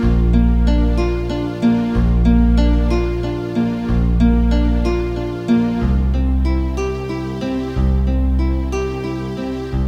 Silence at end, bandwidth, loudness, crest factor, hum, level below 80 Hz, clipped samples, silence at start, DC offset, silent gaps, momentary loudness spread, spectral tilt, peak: 0 s; 7 kHz; -18 LUFS; 12 dB; none; -18 dBFS; under 0.1%; 0 s; under 0.1%; none; 8 LU; -8.5 dB/octave; -2 dBFS